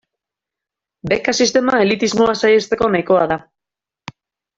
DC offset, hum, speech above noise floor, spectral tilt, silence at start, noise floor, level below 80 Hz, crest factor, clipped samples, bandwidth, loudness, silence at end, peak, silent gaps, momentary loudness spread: under 0.1%; none; 71 dB; -4 dB/octave; 1.05 s; -86 dBFS; -52 dBFS; 16 dB; under 0.1%; 8 kHz; -15 LUFS; 1.2 s; -2 dBFS; none; 6 LU